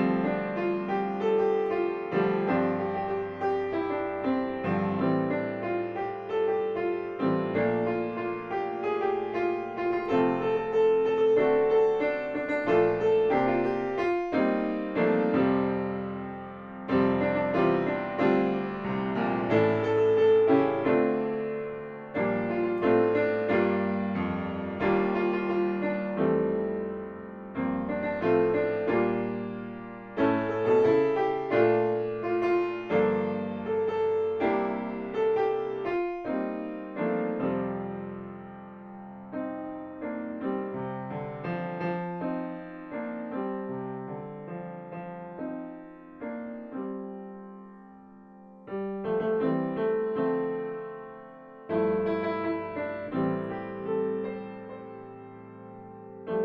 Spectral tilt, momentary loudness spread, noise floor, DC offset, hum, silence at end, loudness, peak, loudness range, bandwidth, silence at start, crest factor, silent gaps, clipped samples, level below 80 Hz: -9 dB/octave; 15 LU; -50 dBFS; under 0.1%; none; 0 s; -28 LUFS; -12 dBFS; 11 LU; 6.2 kHz; 0 s; 16 dB; none; under 0.1%; -60 dBFS